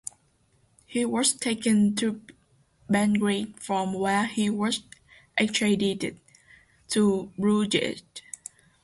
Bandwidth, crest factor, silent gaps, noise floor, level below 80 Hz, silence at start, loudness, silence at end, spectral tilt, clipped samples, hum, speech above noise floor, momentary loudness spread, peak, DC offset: 11.5 kHz; 18 dB; none; -65 dBFS; -62 dBFS; 0.9 s; -26 LUFS; 0.65 s; -4 dB/octave; under 0.1%; none; 40 dB; 17 LU; -8 dBFS; under 0.1%